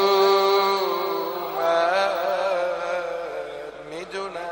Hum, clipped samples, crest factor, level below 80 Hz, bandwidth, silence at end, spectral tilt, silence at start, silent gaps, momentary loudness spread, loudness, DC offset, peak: none; under 0.1%; 14 dB; -62 dBFS; 16.5 kHz; 0 s; -3.5 dB/octave; 0 s; none; 15 LU; -23 LUFS; under 0.1%; -8 dBFS